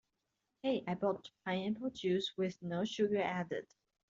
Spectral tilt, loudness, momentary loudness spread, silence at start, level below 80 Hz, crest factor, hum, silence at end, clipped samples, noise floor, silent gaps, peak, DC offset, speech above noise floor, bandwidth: -4.5 dB/octave; -38 LUFS; 7 LU; 0.65 s; -76 dBFS; 16 dB; none; 0.45 s; under 0.1%; -86 dBFS; none; -22 dBFS; under 0.1%; 49 dB; 7.8 kHz